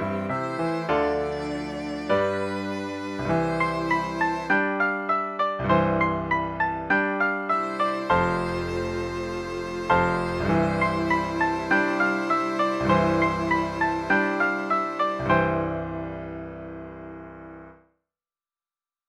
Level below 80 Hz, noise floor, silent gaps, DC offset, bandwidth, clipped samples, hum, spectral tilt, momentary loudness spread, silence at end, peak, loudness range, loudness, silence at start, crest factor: -48 dBFS; under -90 dBFS; none; under 0.1%; 12 kHz; under 0.1%; none; -6.5 dB/octave; 10 LU; 1.35 s; -8 dBFS; 4 LU; -25 LUFS; 0 s; 18 dB